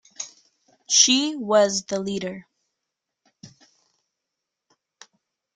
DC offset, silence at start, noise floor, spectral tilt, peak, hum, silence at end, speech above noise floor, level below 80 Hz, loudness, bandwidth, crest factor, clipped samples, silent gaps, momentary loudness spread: under 0.1%; 0.2 s; -83 dBFS; -1.5 dB/octave; -2 dBFS; none; 2.1 s; 63 dB; -70 dBFS; -20 LUFS; 11 kHz; 24 dB; under 0.1%; none; 21 LU